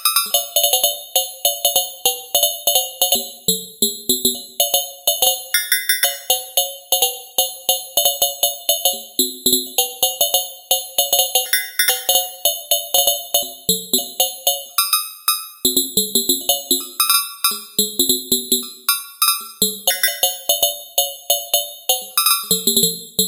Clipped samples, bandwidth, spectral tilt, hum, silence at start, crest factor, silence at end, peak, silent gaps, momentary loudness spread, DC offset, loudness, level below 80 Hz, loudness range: under 0.1%; 17 kHz; 0 dB/octave; none; 0 s; 16 dB; 0 s; -2 dBFS; none; 5 LU; under 0.1%; -16 LUFS; -60 dBFS; 1 LU